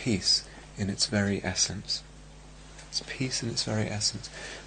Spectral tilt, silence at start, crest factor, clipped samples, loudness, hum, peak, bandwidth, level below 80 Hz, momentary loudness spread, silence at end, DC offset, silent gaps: -3 dB/octave; 0 s; 20 dB; under 0.1%; -29 LUFS; none; -12 dBFS; 9.6 kHz; -52 dBFS; 14 LU; 0 s; under 0.1%; none